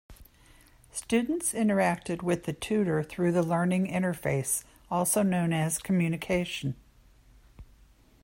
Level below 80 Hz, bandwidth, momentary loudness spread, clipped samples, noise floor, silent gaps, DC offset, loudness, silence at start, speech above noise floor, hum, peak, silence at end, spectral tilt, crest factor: -56 dBFS; 16.5 kHz; 8 LU; under 0.1%; -59 dBFS; none; under 0.1%; -28 LUFS; 0.1 s; 31 dB; none; -12 dBFS; 0.6 s; -5 dB/octave; 16 dB